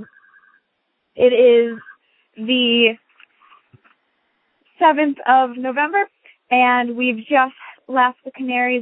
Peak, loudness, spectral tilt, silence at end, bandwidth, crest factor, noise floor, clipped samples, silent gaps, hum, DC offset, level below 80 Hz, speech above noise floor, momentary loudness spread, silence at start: -2 dBFS; -17 LUFS; -8.5 dB/octave; 0 s; 4 kHz; 18 dB; -71 dBFS; under 0.1%; none; none; under 0.1%; -68 dBFS; 55 dB; 10 LU; 0 s